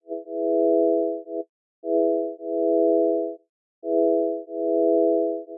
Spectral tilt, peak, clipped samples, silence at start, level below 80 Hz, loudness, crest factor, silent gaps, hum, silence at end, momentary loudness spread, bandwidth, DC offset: -13 dB/octave; -10 dBFS; under 0.1%; 0.1 s; under -90 dBFS; -23 LUFS; 12 dB; 1.49-1.82 s, 3.49-3.82 s; none; 0 s; 14 LU; 0.8 kHz; under 0.1%